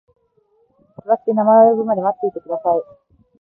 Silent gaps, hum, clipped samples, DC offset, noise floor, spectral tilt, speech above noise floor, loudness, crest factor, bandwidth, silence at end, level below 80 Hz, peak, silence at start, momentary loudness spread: none; none; under 0.1%; under 0.1%; -60 dBFS; -12.5 dB/octave; 45 dB; -16 LUFS; 16 dB; 2 kHz; 0.55 s; -66 dBFS; -2 dBFS; 1.05 s; 12 LU